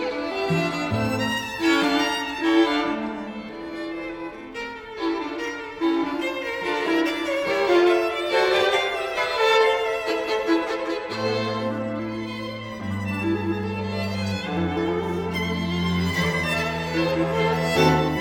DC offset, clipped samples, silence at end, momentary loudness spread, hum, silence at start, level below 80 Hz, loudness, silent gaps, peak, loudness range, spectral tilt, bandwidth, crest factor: under 0.1%; under 0.1%; 0 s; 12 LU; none; 0 s; -50 dBFS; -24 LUFS; none; -6 dBFS; 7 LU; -5.5 dB/octave; 18 kHz; 18 dB